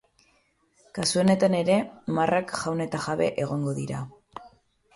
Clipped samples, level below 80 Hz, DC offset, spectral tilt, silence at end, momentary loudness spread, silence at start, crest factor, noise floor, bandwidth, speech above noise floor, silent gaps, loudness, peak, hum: under 0.1%; -62 dBFS; under 0.1%; -5.5 dB/octave; 0.45 s; 18 LU; 0.95 s; 18 dB; -66 dBFS; 11.5 kHz; 41 dB; none; -26 LUFS; -10 dBFS; none